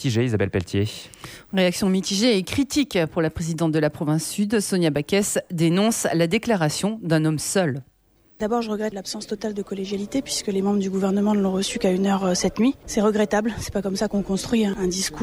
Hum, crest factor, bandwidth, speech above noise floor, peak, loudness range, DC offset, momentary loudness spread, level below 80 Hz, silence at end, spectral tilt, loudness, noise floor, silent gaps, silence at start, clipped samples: none; 14 dB; over 20 kHz; 29 dB; -8 dBFS; 4 LU; under 0.1%; 8 LU; -48 dBFS; 0 s; -5 dB/octave; -23 LUFS; -51 dBFS; none; 0 s; under 0.1%